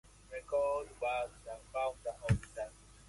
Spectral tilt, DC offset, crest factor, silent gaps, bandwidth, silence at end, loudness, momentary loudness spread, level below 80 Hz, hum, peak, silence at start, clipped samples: -6 dB/octave; under 0.1%; 22 dB; none; 11.5 kHz; 0.05 s; -38 LUFS; 13 LU; -52 dBFS; 50 Hz at -60 dBFS; -18 dBFS; 0.3 s; under 0.1%